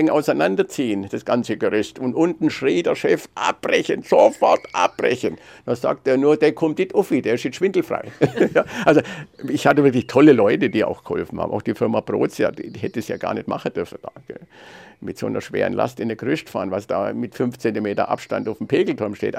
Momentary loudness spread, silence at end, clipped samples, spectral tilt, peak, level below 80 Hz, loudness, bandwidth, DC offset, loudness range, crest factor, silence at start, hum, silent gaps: 11 LU; 0 s; under 0.1%; -6 dB/octave; -2 dBFS; -62 dBFS; -20 LUFS; 15.5 kHz; under 0.1%; 9 LU; 18 dB; 0 s; none; none